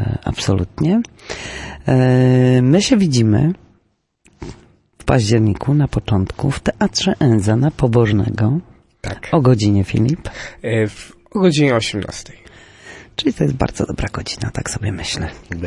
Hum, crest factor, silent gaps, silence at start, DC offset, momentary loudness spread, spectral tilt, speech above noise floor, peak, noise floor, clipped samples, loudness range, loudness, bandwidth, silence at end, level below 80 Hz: none; 14 dB; none; 0 s; under 0.1%; 16 LU; -6 dB/octave; 46 dB; -2 dBFS; -62 dBFS; under 0.1%; 5 LU; -17 LUFS; 11.5 kHz; 0 s; -38 dBFS